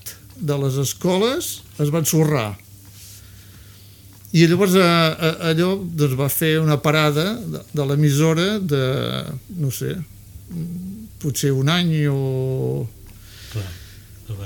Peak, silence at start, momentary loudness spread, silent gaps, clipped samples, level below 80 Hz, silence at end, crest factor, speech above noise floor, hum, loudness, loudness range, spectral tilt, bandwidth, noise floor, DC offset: -2 dBFS; 0.05 s; 18 LU; none; under 0.1%; -48 dBFS; 0 s; 18 dB; 25 dB; none; -20 LUFS; 5 LU; -5.5 dB/octave; 19 kHz; -44 dBFS; under 0.1%